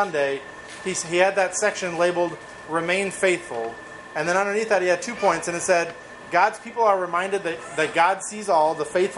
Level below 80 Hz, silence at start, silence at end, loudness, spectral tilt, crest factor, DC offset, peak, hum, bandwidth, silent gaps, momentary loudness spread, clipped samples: -62 dBFS; 0 s; 0 s; -23 LUFS; -3 dB/octave; 20 dB; under 0.1%; -4 dBFS; none; 11.5 kHz; none; 11 LU; under 0.1%